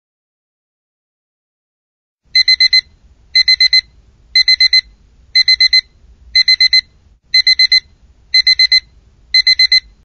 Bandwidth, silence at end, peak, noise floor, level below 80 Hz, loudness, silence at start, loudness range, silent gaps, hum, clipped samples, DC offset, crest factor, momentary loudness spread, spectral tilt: 12.5 kHz; 0.25 s; 0 dBFS; -48 dBFS; -46 dBFS; -9 LUFS; 2.35 s; 2 LU; none; none; under 0.1%; under 0.1%; 12 dB; 6 LU; 3 dB/octave